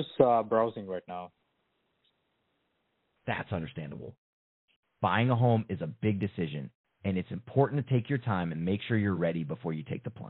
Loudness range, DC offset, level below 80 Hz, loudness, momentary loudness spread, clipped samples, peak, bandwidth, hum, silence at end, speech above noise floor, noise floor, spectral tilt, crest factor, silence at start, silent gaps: 11 LU; under 0.1%; -68 dBFS; -31 LUFS; 16 LU; under 0.1%; -8 dBFS; 4.1 kHz; none; 0 s; 47 dB; -77 dBFS; -6.5 dB/octave; 24 dB; 0 s; 4.18-4.68 s, 4.76-4.83 s, 6.75-6.84 s